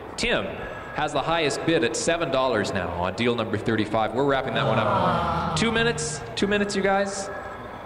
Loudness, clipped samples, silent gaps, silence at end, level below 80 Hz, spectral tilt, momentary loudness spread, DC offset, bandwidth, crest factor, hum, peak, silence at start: -24 LUFS; under 0.1%; none; 0 s; -46 dBFS; -4.5 dB/octave; 7 LU; under 0.1%; 15 kHz; 16 dB; none; -8 dBFS; 0 s